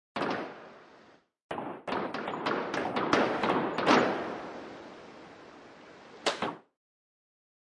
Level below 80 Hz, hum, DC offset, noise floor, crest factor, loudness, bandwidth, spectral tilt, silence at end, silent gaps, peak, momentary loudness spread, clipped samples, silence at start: -70 dBFS; none; under 0.1%; -59 dBFS; 26 dB; -31 LUFS; 11.5 kHz; -4.5 dB/octave; 1.05 s; 1.42-1.49 s; -8 dBFS; 25 LU; under 0.1%; 0.15 s